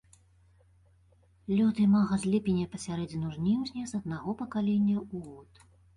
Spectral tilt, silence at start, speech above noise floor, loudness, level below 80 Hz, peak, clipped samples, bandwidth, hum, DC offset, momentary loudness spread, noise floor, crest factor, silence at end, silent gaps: -7 dB/octave; 1.5 s; 34 dB; -30 LUFS; -60 dBFS; -16 dBFS; under 0.1%; 11 kHz; none; under 0.1%; 11 LU; -63 dBFS; 14 dB; 0.55 s; none